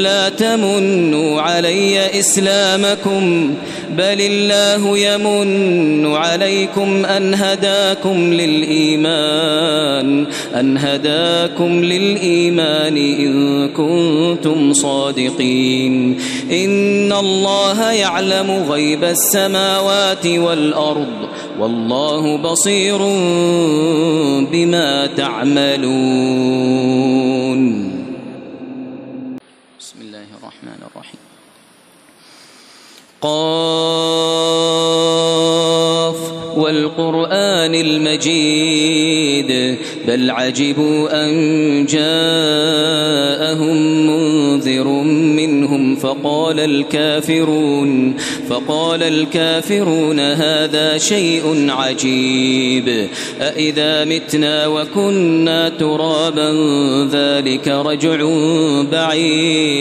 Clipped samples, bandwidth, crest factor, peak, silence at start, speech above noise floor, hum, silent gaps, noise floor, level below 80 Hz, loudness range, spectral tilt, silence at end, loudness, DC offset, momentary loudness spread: under 0.1%; 14 kHz; 12 dB; -2 dBFS; 0 s; 33 dB; none; none; -47 dBFS; -62 dBFS; 2 LU; -4 dB/octave; 0 s; -14 LUFS; under 0.1%; 4 LU